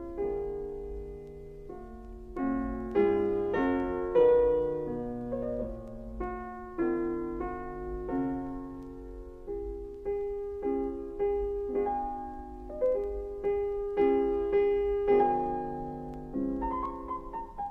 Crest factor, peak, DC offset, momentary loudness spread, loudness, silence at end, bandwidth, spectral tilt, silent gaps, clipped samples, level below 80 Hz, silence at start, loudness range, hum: 18 dB; -12 dBFS; under 0.1%; 16 LU; -31 LUFS; 0 s; 4.4 kHz; -9 dB/octave; none; under 0.1%; -46 dBFS; 0 s; 8 LU; none